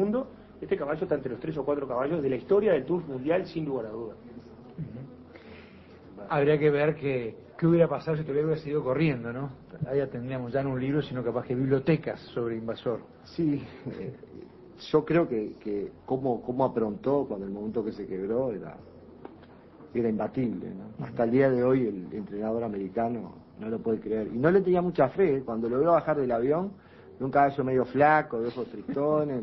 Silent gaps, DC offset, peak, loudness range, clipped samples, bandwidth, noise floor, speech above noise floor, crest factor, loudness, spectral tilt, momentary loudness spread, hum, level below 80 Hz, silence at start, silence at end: none; under 0.1%; -8 dBFS; 7 LU; under 0.1%; 6 kHz; -51 dBFS; 23 dB; 20 dB; -28 LUFS; -10 dB/octave; 17 LU; none; -58 dBFS; 0 s; 0 s